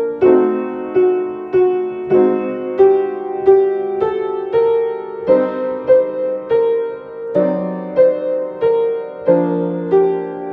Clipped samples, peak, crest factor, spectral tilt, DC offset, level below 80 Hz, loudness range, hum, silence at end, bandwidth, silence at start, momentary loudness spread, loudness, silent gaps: under 0.1%; 0 dBFS; 14 dB; -10 dB/octave; under 0.1%; -58 dBFS; 2 LU; none; 0 s; 4.5 kHz; 0 s; 8 LU; -16 LUFS; none